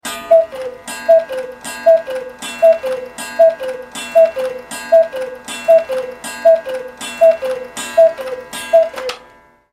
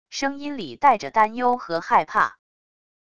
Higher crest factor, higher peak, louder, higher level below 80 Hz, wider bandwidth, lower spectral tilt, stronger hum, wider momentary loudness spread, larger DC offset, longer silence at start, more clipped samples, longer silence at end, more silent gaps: about the same, 14 dB vs 18 dB; first, 0 dBFS vs -4 dBFS; first, -15 LUFS vs -22 LUFS; about the same, -56 dBFS vs -60 dBFS; first, 15 kHz vs 8.6 kHz; second, -2 dB/octave vs -3.5 dB/octave; neither; first, 13 LU vs 8 LU; second, under 0.1% vs 0.5%; about the same, 0.05 s vs 0.1 s; neither; second, 0.55 s vs 0.75 s; neither